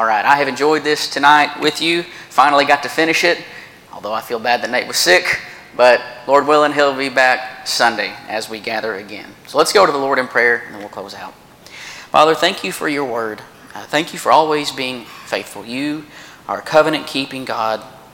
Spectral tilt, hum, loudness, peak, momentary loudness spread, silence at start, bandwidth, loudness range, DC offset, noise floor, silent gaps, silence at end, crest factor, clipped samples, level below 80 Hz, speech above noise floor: -2.5 dB/octave; none; -15 LUFS; 0 dBFS; 18 LU; 0 s; 17.5 kHz; 5 LU; under 0.1%; -36 dBFS; none; 0.15 s; 16 dB; under 0.1%; -58 dBFS; 20 dB